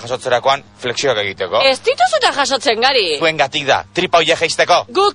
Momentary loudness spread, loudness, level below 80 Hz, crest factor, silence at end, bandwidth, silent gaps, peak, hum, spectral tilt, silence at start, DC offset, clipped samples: 5 LU; -14 LUFS; -52 dBFS; 14 dB; 0 s; 10.5 kHz; none; 0 dBFS; none; -2.5 dB/octave; 0 s; under 0.1%; under 0.1%